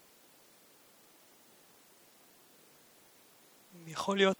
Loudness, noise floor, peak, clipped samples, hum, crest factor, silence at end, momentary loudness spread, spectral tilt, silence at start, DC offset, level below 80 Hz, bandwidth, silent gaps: -34 LUFS; -62 dBFS; -12 dBFS; under 0.1%; none; 26 dB; 0.05 s; 21 LU; -4.5 dB/octave; 3.75 s; under 0.1%; -84 dBFS; over 20 kHz; none